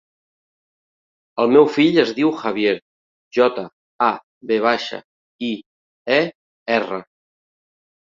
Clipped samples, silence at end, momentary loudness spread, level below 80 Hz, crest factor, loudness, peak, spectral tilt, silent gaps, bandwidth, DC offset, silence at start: under 0.1%; 1.15 s; 17 LU; -66 dBFS; 20 dB; -19 LUFS; -2 dBFS; -6 dB/octave; 2.82-3.31 s, 3.73-3.99 s, 4.24-4.41 s, 5.05-5.39 s, 5.66-6.05 s, 6.35-6.66 s; 7.4 kHz; under 0.1%; 1.35 s